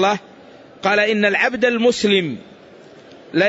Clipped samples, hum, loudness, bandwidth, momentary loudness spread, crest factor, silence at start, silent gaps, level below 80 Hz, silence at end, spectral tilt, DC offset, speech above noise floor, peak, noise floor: under 0.1%; none; -17 LUFS; 8 kHz; 11 LU; 16 dB; 0 s; none; -60 dBFS; 0 s; -4.5 dB/octave; under 0.1%; 26 dB; -4 dBFS; -43 dBFS